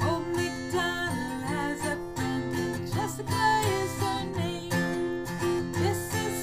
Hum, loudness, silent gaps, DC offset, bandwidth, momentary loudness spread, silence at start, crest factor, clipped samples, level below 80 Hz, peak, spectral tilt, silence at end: none; -29 LUFS; none; under 0.1%; 15.5 kHz; 6 LU; 0 s; 18 dB; under 0.1%; -52 dBFS; -12 dBFS; -5 dB/octave; 0 s